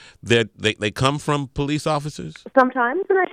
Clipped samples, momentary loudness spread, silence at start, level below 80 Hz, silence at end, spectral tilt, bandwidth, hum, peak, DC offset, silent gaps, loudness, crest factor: under 0.1%; 6 LU; 0.25 s; -46 dBFS; 0 s; -5 dB/octave; 14.5 kHz; none; -2 dBFS; under 0.1%; none; -21 LUFS; 18 dB